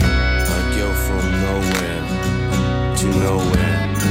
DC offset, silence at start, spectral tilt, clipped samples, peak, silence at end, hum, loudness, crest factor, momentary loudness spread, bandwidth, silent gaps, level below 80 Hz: under 0.1%; 0 s; -5.5 dB/octave; under 0.1%; -2 dBFS; 0 s; none; -19 LUFS; 16 dB; 3 LU; 16.5 kHz; none; -24 dBFS